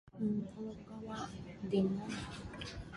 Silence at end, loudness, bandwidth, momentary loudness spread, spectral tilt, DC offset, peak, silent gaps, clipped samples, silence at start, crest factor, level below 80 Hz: 0 s; -40 LUFS; 11.5 kHz; 12 LU; -6.5 dB/octave; under 0.1%; -20 dBFS; none; under 0.1%; 0.05 s; 18 dB; -58 dBFS